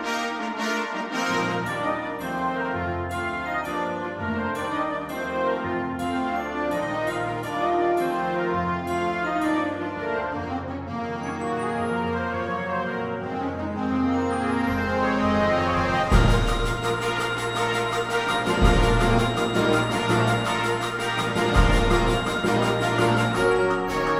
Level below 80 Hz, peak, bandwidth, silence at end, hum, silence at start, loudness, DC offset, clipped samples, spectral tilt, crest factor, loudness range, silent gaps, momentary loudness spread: -32 dBFS; -4 dBFS; 16 kHz; 0 s; none; 0 s; -24 LUFS; under 0.1%; under 0.1%; -5.5 dB/octave; 20 dB; 5 LU; none; 8 LU